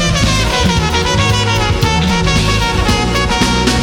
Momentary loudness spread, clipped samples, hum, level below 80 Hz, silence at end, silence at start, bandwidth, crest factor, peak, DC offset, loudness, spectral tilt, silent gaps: 1 LU; under 0.1%; none; -20 dBFS; 0 s; 0 s; 18.5 kHz; 12 dB; 0 dBFS; under 0.1%; -12 LUFS; -4 dB/octave; none